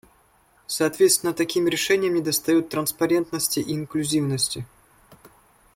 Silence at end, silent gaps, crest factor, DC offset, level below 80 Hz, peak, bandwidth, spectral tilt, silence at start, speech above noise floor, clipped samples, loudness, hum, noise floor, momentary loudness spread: 1.1 s; none; 18 dB; under 0.1%; -60 dBFS; -6 dBFS; 16.5 kHz; -3.5 dB/octave; 0.7 s; 37 dB; under 0.1%; -22 LUFS; none; -59 dBFS; 8 LU